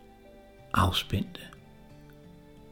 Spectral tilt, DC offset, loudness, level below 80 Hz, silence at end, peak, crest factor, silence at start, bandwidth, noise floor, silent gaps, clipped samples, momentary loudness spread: -5 dB/octave; under 0.1%; -29 LUFS; -48 dBFS; 0.4 s; -10 dBFS; 24 dB; 0.35 s; 18 kHz; -53 dBFS; none; under 0.1%; 27 LU